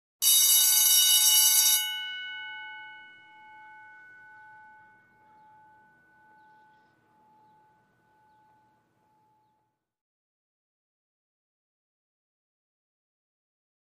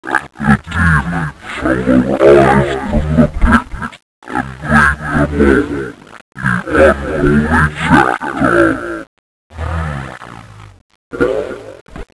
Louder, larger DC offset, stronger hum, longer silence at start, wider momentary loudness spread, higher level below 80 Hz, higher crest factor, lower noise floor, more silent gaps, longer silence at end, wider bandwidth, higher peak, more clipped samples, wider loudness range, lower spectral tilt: second, -19 LUFS vs -13 LUFS; neither; neither; first, 0.2 s vs 0 s; first, 22 LU vs 16 LU; second, under -90 dBFS vs -24 dBFS; first, 24 dB vs 14 dB; first, -77 dBFS vs -34 dBFS; second, none vs 4.02-4.22 s, 6.21-6.32 s, 9.07-9.50 s, 10.81-10.89 s, 10.95-11.11 s, 11.81-11.86 s; first, 10.9 s vs 0.15 s; first, 15.5 kHz vs 11 kHz; second, -8 dBFS vs 0 dBFS; second, under 0.1% vs 0.3%; first, 26 LU vs 6 LU; second, 5.5 dB/octave vs -7 dB/octave